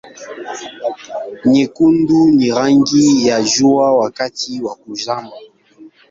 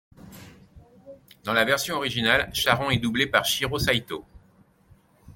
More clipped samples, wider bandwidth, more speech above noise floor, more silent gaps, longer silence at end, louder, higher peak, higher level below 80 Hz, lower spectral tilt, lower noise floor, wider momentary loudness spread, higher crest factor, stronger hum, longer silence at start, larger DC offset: neither; second, 7.8 kHz vs 17 kHz; second, 29 dB vs 34 dB; neither; first, 0.25 s vs 0.05 s; first, -14 LUFS vs -23 LUFS; first, 0 dBFS vs -4 dBFS; about the same, -54 dBFS vs -50 dBFS; about the same, -4.5 dB/octave vs -3.5 dB/octave; second, -43 dBFS vs -59 dBFS; first, 16 LU vs 5 LU; second, 14 dB vs 24 dB; neither; second, 0.05 s vs 0.25 s; neither